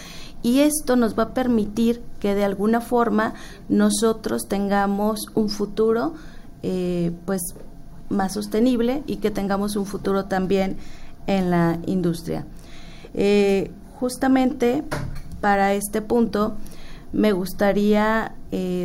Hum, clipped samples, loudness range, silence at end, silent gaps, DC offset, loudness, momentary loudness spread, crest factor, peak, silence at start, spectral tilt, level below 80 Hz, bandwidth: none; under 0.1%; 3 LU; 0 s; none; under 0.1%; -22 LUFS; 12 LU; 14 dB; -6 dBFS; 0 s; -5.5 dB/octave; -38 dBFS; 16 kHz